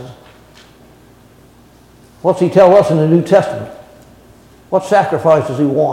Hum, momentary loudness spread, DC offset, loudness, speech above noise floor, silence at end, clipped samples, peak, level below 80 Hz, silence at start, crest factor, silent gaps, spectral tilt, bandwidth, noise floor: none; 11 LU; under 0.1%; -12 LUFS; 33 dB; 0 s; under 0.1%; 0 dBFS; -52 dBFS; 0 s; 14 dB; none; -7.5 dB/octave; 13 kHz; -44 dBFS